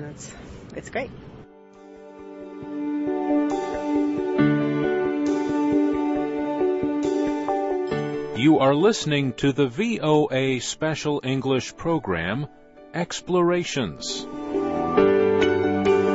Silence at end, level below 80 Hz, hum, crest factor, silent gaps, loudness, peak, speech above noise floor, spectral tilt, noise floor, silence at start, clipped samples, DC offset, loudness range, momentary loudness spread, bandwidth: 0 s; -52 dBFS; none; 18 dB; none; -23 LUFS; -6 dBFS; 24 dB; -5.5 dB/octave; -47 dBFS; 0 s; under 0.1%; under 0.1%; 6 LU; 15 LU; 8 kHz